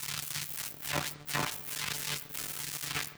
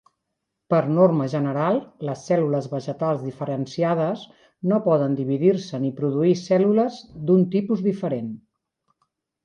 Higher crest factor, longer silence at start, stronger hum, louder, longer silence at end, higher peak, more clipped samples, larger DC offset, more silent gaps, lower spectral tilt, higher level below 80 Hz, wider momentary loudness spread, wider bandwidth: about the same, 20 dB vs 16 dB; second, 0 s vs 0.7 s; neither; second, -35 LUFS vs -22 LUFS; second, 0 s vs 1.1 s; second, -16 dBFS vs -6 dBFS; neither; neither; neither; second, -1.5 dB/octave vs -8 dB/octave; about the same, -62 dBFS vs -66 dBFS; second, 3 LU vs 11 LU; first, over 20 kHz vs 9 kHz